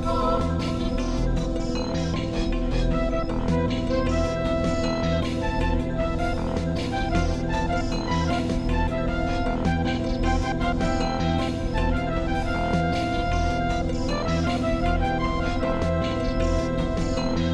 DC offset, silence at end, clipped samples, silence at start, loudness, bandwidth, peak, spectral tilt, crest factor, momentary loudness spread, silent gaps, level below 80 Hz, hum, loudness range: under 0.1%; 0 s; under 0.1%; 0 s; -25 LUFS; 10.5 kHz; -10 dBFS; -6.5 dB/octave; 14 dB; 2 LU; none; -30 dBFS; none; 1 LU